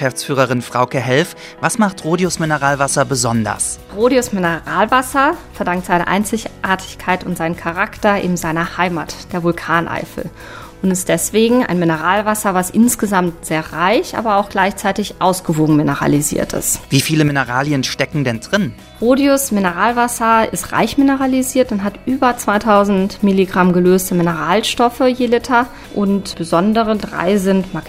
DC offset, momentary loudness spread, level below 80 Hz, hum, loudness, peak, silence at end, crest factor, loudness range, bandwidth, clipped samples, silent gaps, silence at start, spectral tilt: 0.1%; 7 LU; -42 dBFS; none; -16 LUFS; 0 dBFS; 0 s; 16 dB; 4 LU; 16 kHz; under 0.1%; none; 0 s; -4.5 dB/octave